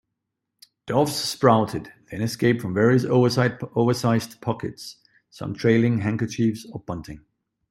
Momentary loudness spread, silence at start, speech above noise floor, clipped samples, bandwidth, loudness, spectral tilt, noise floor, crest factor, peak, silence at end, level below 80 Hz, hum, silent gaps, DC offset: 16 LU; 0.85 s; 59 dB; under 0.1%; 14 kHz; -22 LUFS; -6 dB/octave; -81 dBFS; 20 dB; -2 dBFS; 0.55 s; -58 dBFS; none; none; under 0.1%